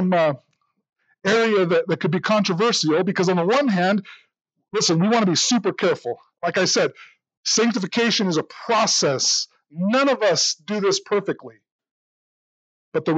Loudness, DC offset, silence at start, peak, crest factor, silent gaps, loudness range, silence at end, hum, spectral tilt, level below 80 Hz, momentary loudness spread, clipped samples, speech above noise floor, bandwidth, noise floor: -20 LUFS; under 0.1%; 0 s; -8 dBFS; 12 dB; 7.37-7.43 s, 11.72-11.79 s, 11.91-12.92 s; 2 LU; 0 s; none; -3.5 dB/octave; -80 dBFS; 9 LU; under 0.1%; over 70 dB; 9 kHz; under -90 dBFS